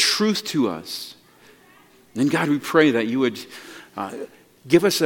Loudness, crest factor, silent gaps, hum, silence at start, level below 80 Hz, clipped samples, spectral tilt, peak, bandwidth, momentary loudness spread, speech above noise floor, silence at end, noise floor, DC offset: -21 LUFS; 20 dB; none; none; 0 s; -68 dBFS; under 0.1%; -4 dB/octave; -2 dBFS; 17.5 kHz; 20 LU; 32 dB; 0 s; -53 dBFS; under 0.1%